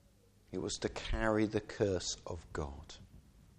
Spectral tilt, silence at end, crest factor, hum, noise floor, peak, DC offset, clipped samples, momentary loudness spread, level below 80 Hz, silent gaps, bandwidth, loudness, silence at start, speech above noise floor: -4.5 dB/octave; 0.15 s; 20 dB; none; -66 dBFS; -18 dBFS; under 0.1%; under 0.1%; 15 LU; -48 dBFS; none; 10.5 kHz; -37 LUFS; 0.5 s; 29 dB